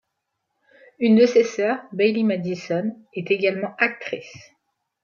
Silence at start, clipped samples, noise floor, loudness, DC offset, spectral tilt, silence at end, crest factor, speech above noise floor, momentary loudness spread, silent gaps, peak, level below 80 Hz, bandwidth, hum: 1 s; under 0.1%; -78 dBFS; -21 LUFS; under 0.1%; -6 dB/octave; 0.65 s; 18 dB; 57 dB; 15 LU; none; -4 dBFS; -74 dBFS; 7.2 kHz; none